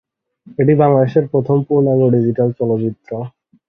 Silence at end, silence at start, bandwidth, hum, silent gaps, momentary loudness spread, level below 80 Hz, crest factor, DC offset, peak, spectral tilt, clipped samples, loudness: 0.4 s; 0.5 s; 5.2 kHz; none; none; 15 LU; -54 dBFS; 14 dB; under 0.1%; -2 dBFS; -12 dB/octave; under 0.1%; -15 LUFS